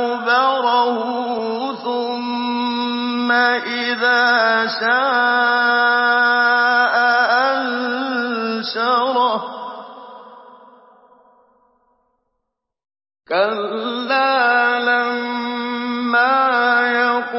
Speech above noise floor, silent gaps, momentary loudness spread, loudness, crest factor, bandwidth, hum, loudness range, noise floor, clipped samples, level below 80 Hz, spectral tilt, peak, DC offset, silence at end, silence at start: 61 dB; none; 9 LU; -17 LUFS; 14 dB; 5.8 kHz; none; 9 LU; -77 dBFS; under 0.1%; -82 dBFS; -6 dB/octave; -4 dBFS; under 0.1%; 0 s; 0 s